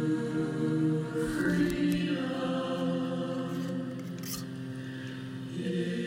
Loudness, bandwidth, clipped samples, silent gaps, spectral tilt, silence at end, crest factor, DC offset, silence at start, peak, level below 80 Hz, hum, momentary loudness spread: -32 LUFS; 16 kHz; under 0.1%; none; -6.5 dB/octave; 0 s; 14 dB; under 0.1%; 0 s; -16 dBFS; -56 dBFS; none; 11 LU